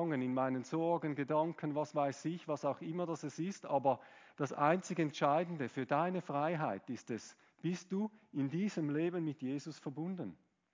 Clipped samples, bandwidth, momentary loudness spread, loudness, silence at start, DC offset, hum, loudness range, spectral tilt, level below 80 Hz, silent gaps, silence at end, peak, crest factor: under 0.1%; 7.6 kHz; 10 LU; -38 LUFS; 0 s; under 0.1%; none; 4 LU; -6.5 dB/octave; -86 dBFS; none; 0.4 s; -18 dBFS; 20 dB